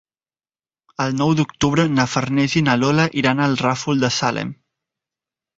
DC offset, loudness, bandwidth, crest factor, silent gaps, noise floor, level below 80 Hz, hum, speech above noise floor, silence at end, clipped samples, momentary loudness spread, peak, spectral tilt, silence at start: under 0.1%; -18 LUFS; 8 kHz; 18 dB; none; under -90 dBFS; -50 dBFS; none; over 72 dB; 1.05 s; under 0.1%; 7 LU; -2 dBFS; -5 dB/octave; 1 s